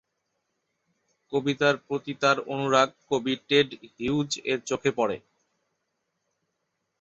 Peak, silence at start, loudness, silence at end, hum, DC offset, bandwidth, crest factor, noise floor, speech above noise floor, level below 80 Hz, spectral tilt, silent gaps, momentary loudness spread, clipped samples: -6 dBFS; 1.3 s; -26 LUFS; 1.85 s; none; under 0.1%; 8 kHz; 22 dB; -79 dBFS; 53 dB; -66 dBFS; -4.5 dB/octave; none; 7 LU; under 0.1%